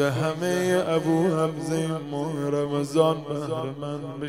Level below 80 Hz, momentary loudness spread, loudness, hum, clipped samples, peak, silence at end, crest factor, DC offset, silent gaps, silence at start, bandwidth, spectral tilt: -64 dBFS; 8 LU; -25 LUFS; none; under 0.1%; -6 dBFS; 0 s; 18 dB; 0.1%; none; 0 s; 16 kHz; -6 dB/octave